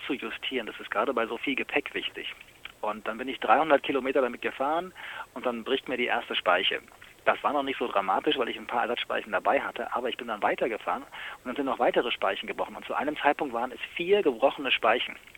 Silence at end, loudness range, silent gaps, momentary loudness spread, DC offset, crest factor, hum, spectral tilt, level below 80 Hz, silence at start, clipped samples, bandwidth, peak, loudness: 0.2 s; 2 LU; none; 10 LU; under 0.1%; 22 dB; none; -4 dB/octave; -64 dBFS; 0 s; under 0.1%; 18.5 kHz; -6 dBFS; -28 LUFS